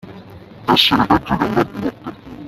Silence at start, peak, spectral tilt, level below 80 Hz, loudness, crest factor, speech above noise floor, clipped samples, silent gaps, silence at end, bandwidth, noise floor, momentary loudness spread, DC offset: 0.05 s; 0 dBFS; -5 dB/octave; -42 dBFS; -16 LUFS; 18 dB; 21 dB; under 0.1%; none; 0 s; 15.5 kHz; -38 dBFS; 16 LU; under 0.1%